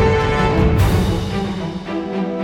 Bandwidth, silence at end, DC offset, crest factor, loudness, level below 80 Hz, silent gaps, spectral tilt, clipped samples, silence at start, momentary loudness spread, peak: 16.5 kHz; 0 s; under 0.1%; 14 dB; -18 LUFS; -26 dBFS; none; -7 dB/octave; under 0.1%; 0 s; 9 LU; -4 dBFS